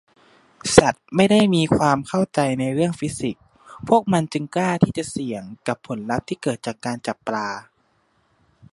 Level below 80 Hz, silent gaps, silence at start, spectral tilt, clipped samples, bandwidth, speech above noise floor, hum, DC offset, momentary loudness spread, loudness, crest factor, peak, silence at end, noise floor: -50 dBFS; none; 0.65 s; -5.5 dB/octave; under 0.1%; 11.5 kHz; 44 dB; none; under 0.1%; 13 LU; -21 LUFS; 22 dB; 0 dBFS; 1.1 s; -64 dBFS